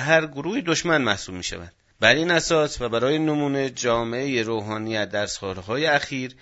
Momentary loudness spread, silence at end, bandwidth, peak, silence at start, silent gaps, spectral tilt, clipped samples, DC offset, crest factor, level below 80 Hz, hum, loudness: 9 LU; 0.1 s; 8 kHz; 0 dBFS; 0 s; none; -4 dB/octave; under 0.1%; under 0.1%; 24 dB; -52 dBFS; none; -23 LUFS